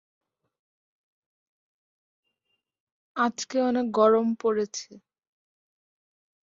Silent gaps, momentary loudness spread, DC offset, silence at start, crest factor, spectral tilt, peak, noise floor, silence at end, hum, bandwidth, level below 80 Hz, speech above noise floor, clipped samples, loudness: none; 13 LU; under 0.1%; 3.15 s; 22 dB; -4.5 dB/octave; -8 dBFS; -79 dBFS; 1.5 s; none; 7.8 kHz; -74 dBFS; 55 dB; under 0.1%; -25 LUFS